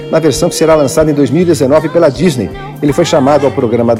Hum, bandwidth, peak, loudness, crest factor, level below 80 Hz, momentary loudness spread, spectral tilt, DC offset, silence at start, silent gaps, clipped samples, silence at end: none; 16.5 kHz; 0 dBFS; -10 LUFS; 10 dB; -36 dBFS; 5 LU; -6 dB/octave; 0.2%; 0 s; none; under 0.1%; 0 s